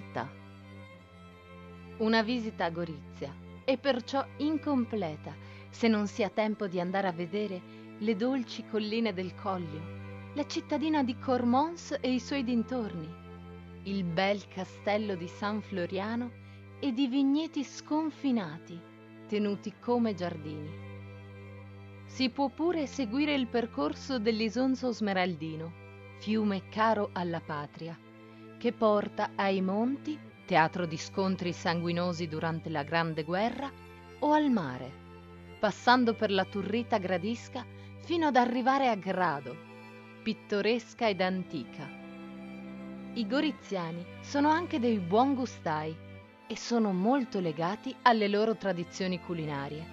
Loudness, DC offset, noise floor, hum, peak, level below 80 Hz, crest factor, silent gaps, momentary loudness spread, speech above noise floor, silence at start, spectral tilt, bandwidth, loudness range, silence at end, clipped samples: -31 LUFS; under 0.1%; -52 dBFS; none; -6 dBFS; -68 dBFS; 26 dB; none; 20 LU; 22 dB; 0 s; -6 dB/octave; 7.8 kHz; 4 LU; 0 s; under 0.1%